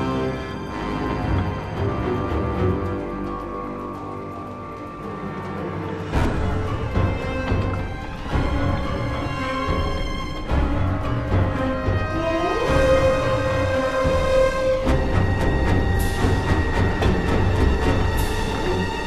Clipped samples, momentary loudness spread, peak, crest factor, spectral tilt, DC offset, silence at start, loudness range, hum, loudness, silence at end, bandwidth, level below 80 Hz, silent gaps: under 0.1%; 10 LU; -4 dBFS; 16 dB; -6.5 dB/octave; 0.5%; 0 s; 7 LU; none; -23 LUFS; 0 s; 14 kHz; -28 dBFS; none